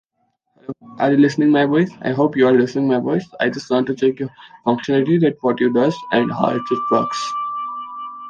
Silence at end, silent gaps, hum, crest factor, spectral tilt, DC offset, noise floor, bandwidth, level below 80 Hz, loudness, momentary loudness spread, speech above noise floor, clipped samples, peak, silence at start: 0 s; none; none; 16 dB; -7 dB/octave; under 0.1%; -69 dBFS; 9 kHz; -62 dBFS; -18 LUFS; 14 LU; 51 dB; under 0.1%; -2 dBFS; 0.7 s